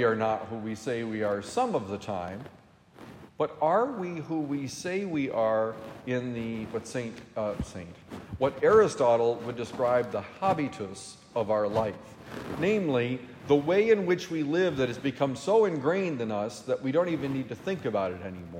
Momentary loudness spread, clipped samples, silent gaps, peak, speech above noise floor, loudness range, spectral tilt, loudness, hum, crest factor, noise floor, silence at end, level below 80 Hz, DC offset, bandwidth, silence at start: 14 LU; under 0.1%; none; -10 dBFS; 23 dB; 5 LU; -6 dB/octave; -29 LUFS; none; 20 dB; -51 dBFS; 0 s; -60 dBFS; under 0.1%; 15 kHz; 0 s